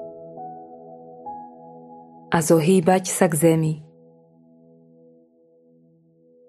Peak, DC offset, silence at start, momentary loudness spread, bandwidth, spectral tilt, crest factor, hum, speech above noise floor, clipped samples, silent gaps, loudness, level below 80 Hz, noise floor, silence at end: -2 dBFS; under 0.1%; 0 s; 25 LU; 14.5 kHz; -5.5 dB/octave; 22 dB; none; 39 dB; under 0.1%; none; -19 LUFS; -66 dBFS; -57 dBFS; 2.65 s